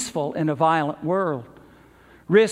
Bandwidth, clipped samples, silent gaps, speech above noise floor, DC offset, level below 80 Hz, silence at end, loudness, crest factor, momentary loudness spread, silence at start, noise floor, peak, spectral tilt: 12.5 kHz; under 0.1%; none; 29 dB; under 0.1%; -62 dBFS; 0 s; -23 LUFS; 20 dB; 7 LU; 0 s; -51 dBFS; -4 dBFS; -5.5 dB/octave